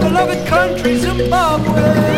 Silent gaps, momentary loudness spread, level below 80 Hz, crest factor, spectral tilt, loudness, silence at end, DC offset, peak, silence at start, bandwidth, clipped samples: none; 2 LU; -30 dBFS; 14 dB; -6 dB/octave; -14 LUFS; 0 s; under 0.1%; 0 dBFS; 0 s; 16.5 kHz; under 0.1%